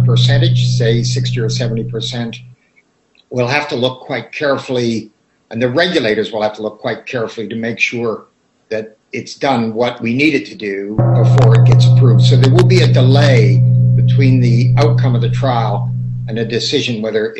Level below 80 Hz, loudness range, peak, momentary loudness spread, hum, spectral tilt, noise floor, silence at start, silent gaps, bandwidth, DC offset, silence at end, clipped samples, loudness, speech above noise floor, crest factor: -40 dBFS; 10 LU; 0 dBFS; 14 LU; none; -6.5 dB/octave; -56 dBFS; 0 s; none; 8.2 kHz; under 0.1%; 0 s; under 0.1%; -13 LUFS; 43 dB; 12 dB